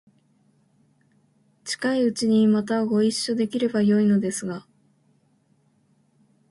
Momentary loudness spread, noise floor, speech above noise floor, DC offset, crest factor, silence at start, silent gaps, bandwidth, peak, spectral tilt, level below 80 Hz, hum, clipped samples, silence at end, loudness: 12 LU; -64 dBFS; 43 dB; under 0.1%; 14 dB; 1.65 s; none; 11.5 kHz; -10 dBFS; -5.5 dB/octave; -68 dBFS; none; under 0.1%; 1.9 s; -22 LUFS